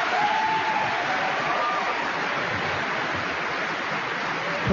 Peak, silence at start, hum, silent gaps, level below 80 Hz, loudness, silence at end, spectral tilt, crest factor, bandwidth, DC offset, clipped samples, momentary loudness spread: -12 dBFS; 0 s; none; none; -60 dBFS; -25 LUFS; 0 s; -4 dB/octave; 14 dB; 7.4 kHz; under 0.1%; under 0.1%; 4 LU